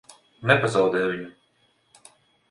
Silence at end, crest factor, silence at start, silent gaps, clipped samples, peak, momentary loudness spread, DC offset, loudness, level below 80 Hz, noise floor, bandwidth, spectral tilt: 1.2 s; 22 dB; 0.4 s; none; under 0.1%; -4 dBFS; 15 LU; under 0.1%; -22 LUFS; -62 dBFS; -66 dBFS; 11.5 kHz; -5.5 dB/octave